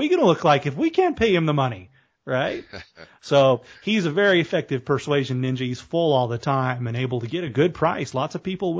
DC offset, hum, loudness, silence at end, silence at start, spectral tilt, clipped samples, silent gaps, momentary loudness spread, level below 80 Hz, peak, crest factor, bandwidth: under 0.1%; none; -22 LUFS; 0 s; 0 s; -6.5 dB/octave; under 0.1%; none; 9 LU; -54 dBFS; -4 dBFS; 18 dB; 8 kHz